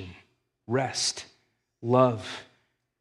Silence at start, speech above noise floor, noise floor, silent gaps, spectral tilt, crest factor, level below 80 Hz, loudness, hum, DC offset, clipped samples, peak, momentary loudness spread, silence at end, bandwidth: 0 s; 45 dB; -70 dBFS; none; -4.5 dB/octave; 22 dB; -74 dBFS; -26 LUFS; none; under 0.1%; under 0.1%; -8 dBFS; 18 LU; 0.55 s; 12 kHz